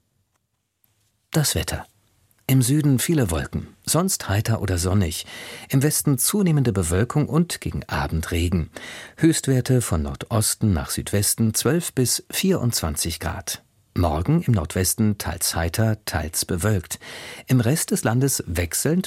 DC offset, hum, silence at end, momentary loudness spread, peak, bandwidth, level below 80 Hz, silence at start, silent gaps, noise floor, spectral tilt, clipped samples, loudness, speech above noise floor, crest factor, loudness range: under 0.1%; none; 0 s; 10 LU; -6 dBFS; 16.5 kHz; -38 dBFS; 1.3 s; none; -73 dBFS; -4.5 dB/octave; under 0.1%; -22 LUFS; 51 dB; 16 dB; 2 LU